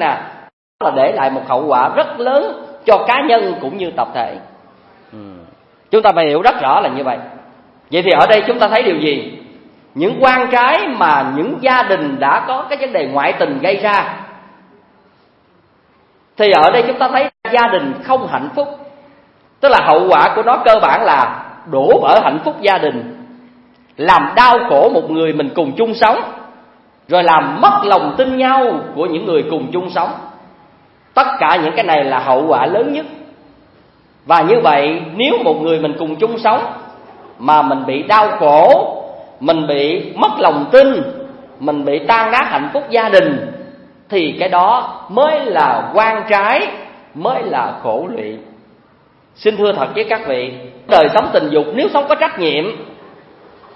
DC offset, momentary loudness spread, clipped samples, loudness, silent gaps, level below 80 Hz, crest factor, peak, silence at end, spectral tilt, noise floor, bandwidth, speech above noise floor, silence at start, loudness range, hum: under 0.1%; 12 LU; 0.1%; -13 LUFS; 0.53-0.79 s; -54 dBFS; 14 dB; 0 dBFS; 0.8 s; -6.5 dB/octave; -52 dBFS; 7.8 kHz; 40 dB; 0 s; 5 LU; none